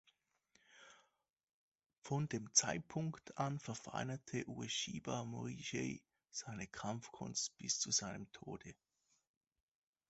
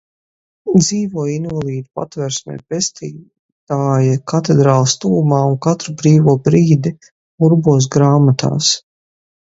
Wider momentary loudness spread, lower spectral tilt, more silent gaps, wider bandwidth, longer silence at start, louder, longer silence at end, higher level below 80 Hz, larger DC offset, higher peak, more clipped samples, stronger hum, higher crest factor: first, 17 LU vs 12 LU; second, -3 dB/octave vs -6 dB/octave; second, 1.43-1.47 s, 1.53-1.75 s, 1.86-1.90 s, 1.98-2.02 s vs 3.39-3.67 s, 7.12-7.38 s; about the same, 8.2 kHz vs 8 kHz; about the same, 0.7 s vs 0.65 s; second, -42 LUFS vs -14 LUFS; first, 1.35 s vs 0.75 s; second, -74 dBFS vs -52 dBFS; neither; second, -18 dBFS vs 0 dBFS; neither; neither; first, 28 dB vs 14 dB